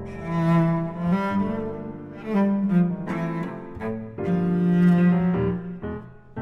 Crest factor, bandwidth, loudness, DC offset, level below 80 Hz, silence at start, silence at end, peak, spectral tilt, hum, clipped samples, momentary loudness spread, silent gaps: 14 dB; 4.3 kHz; -23 LUFS; under 0.1%; -50 dBFS; 0 s; 0 s; -10 dBFS; -10 dB/octave; none; under 0.1%; 15 LU; none